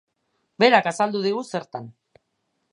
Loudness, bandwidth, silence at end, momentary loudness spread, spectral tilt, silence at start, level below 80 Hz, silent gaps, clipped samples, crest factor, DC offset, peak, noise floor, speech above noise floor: -21 LUFS; 11 kHz; 0.85 s; 17 LU; -4.5 dB/octave; 0.6 s; -78 dBFS; none; under 0.1%; 22 dB; under 0.1%; -2 dBFS; -74 dBFS; 53 dB